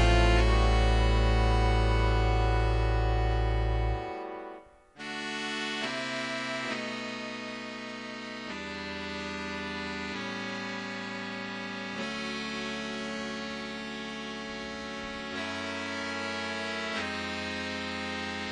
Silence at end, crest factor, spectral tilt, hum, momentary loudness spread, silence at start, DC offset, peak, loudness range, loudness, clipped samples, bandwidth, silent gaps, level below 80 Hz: 0 s; 20 dB; -5.5 dB/octave; none; 11 LU; 0 s; under 0.1%; -10 dBFS; 8 LU; -31 LUFS; under 0.1%; 10 kHz; none; -34 dBFS